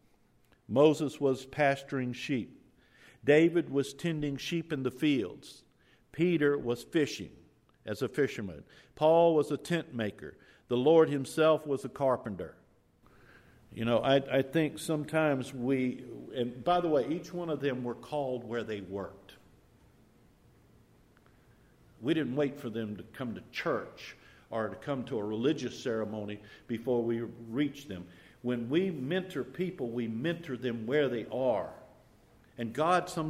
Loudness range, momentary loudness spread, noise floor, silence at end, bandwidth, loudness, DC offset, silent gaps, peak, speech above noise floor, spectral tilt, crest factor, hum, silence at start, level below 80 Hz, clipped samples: 8 LU; 15 LU; -66 dBFS; 0 s; 15.5 kHz; -31 LUFS; under 0.1%; none; -12 dBFS; 35 dB; -6 dB/octave; 20 dB; none; 0.7 s; -66 dBFS; under 0.1%